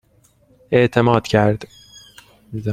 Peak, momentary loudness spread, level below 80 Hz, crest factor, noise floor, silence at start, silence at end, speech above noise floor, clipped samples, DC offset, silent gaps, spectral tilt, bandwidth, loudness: -2 dBFS; 16 LU; -48 dBFS; 18 dB; -56 dBFS; 0.7 s; 0 s; 40 dB; under 0.1%; under 0.1%; none; -7 dB/octave; 14.5 kHz; -17 LUFS